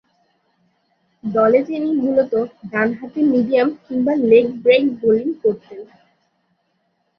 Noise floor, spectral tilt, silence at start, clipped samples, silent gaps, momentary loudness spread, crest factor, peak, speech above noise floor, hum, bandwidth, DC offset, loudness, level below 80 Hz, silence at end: -67 dBFS; -8 dB/octave; 1.25 s; under 0.1%; none; 9 LU; 16 dB; -2 dBFS; 51 dB; none; 5.8 kHz; under 0.1%; -17 LUFS; -62 dBFS; 1.35 s